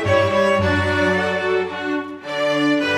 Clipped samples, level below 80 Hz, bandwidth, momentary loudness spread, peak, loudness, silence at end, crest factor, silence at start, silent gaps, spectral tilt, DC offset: under 0.1%; -50 dBFS; 13 kHz; 8 LU; -4 dBFS; -19 LUFS; 0 s; 14 dB; 0 s; none; -5.5 dB/octave; under 0.1%